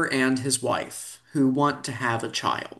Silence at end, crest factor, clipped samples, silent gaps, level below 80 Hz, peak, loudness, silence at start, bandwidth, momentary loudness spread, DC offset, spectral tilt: 0.05 s; 16 dB; under 0.1%; none; -66 dBFS; -8 dBFS; -25 LUFS; 0 s; 12.5 kHz; 9 LU; under 0.1%; -4 dB/octave